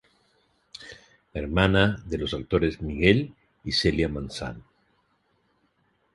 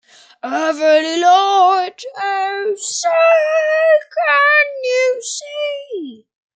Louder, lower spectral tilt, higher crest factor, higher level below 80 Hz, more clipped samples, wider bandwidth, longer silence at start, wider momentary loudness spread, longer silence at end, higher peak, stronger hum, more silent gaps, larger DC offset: second, -25 LUFS vs -15 LUFS; first, -6 dB/octave vs 0 dB/octave; first, 24 dB vs 14 dB; first, -42 dBFS vs -82 dBFS; neither; first, 11.5 kHz vs 9.4 kHz; first, 0.8 s vs 0.45 s; first, 22 LU vs 13 LU; first, 1.55 s vs 0.4 s; about the same, -4 dBFS vs -2 dBFS; neither; neither; neither